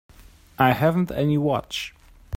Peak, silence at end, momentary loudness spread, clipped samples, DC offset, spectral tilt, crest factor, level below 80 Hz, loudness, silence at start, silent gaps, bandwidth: -4 dBFS; 0 s; 12 LU; under 0.1%; under 0.1%; -6.5 dB/octave; 20 dB; -50 dBFS; -22 LUFS; 0.2 s; none; 16.5 kHz